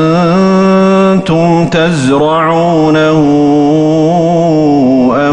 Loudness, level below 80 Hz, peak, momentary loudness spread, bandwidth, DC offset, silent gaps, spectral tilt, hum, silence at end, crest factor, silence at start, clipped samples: -8 LUFS; -40 dBFS; 0 dBFS; 2 LU; 10 kHz; under 0.1%; none; -7 dB/octave; none; 0 s; 8 dB; 0 s; under 0.1%